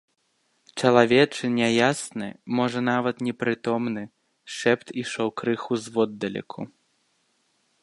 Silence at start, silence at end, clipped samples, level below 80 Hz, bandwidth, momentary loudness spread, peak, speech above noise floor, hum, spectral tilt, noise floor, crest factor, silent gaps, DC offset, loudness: 0.75 s; 1.15 s; under 0.1%; -68 dBFS; 11.5 kHz; 15 LU; -2 dBFS; 46 dB; none; -5 dB/octave; -70 dBFS; 24 dB; none; under 0.1%; -24 LUFS